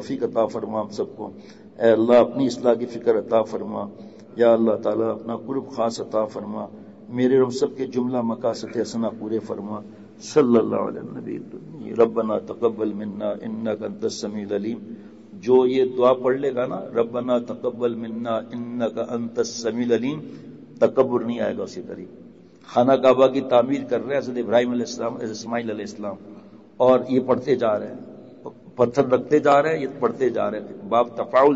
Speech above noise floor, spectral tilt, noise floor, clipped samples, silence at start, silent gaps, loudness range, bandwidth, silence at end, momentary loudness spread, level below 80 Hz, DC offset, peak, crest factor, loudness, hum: 22 dB; -6 dB/octave; -44 dBFS; under 0.1%; 0 s; none; 5 LU; 8 kHz; 0 s; 17 LU; -66 dBFS; under 0.1%; -6 dBFS; 16 dB; -22 LUFS; none